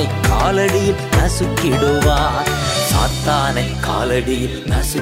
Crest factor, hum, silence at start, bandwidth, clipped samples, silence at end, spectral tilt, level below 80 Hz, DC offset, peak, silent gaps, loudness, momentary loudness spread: 14 dB; none; 0 s; 16.5 kHz; under 0.1%; 0 s; -4.5 dB/octave; -24 dBFS; under 0.1%; -2 dBFS; none; -16 LUFS; 5 LU